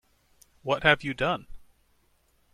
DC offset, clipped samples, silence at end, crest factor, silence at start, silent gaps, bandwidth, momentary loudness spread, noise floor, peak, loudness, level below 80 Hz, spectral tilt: under 0.1%; under 0.1%; 0.95 s; 26 dB; 0.65 s; none; 14.5 kHz; 12 LU; -67 dBFS; -4 dBFS; -26 LUFS; -52 dBFS; -5 dB/octave